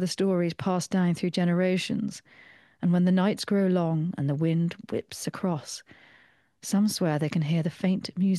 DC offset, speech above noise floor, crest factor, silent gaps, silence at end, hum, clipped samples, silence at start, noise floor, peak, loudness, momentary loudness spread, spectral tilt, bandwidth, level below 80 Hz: under 0.1%; 34 dB; 16 dB; none; 0 s; none; under 0.1%; 0 s; -60 dBFS; -10 dBFS; -27 LUFS; 10 LU; -6.5 dB/octave; 12.5 kHz; -68 dBFS